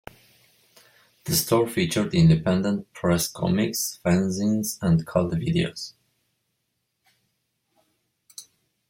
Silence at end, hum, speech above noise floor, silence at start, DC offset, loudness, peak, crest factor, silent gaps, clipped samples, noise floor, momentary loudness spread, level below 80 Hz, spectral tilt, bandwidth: 0.45 s; none; 54 dB; 1.25 s; under 0.1%; -23 LUFS; -8 dBFS; 18 dB; none; under 0.1%; -77 dBFS; 19 LU; -52 dBFS; -5.5 dB/octave; 16.5 kHz